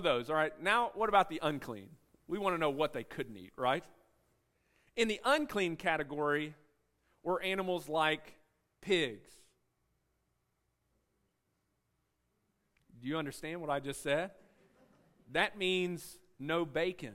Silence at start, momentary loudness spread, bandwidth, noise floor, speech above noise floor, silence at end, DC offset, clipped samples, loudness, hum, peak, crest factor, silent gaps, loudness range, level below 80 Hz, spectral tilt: 0 s; 14 LU; 16 kHz; -81 dBFS; 46 dB; 0 s; under 0.1%; under 0.1%; -34 LUFS; none; -14 dBFS; 22 dB; none; 7 LU; -66 dBFS; -4.5 dB/octave